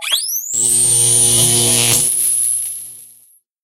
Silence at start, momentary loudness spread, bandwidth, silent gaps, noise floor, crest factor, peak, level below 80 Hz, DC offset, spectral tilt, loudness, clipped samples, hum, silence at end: 0 s; 10 LU; 17 kHz; none; -50 dBFS; 16 dB; 0 dBFS; -46 dBFS; under 0.1%; -1 dB/octave; -11 LUFS; under 0.1%; none; 0.6 s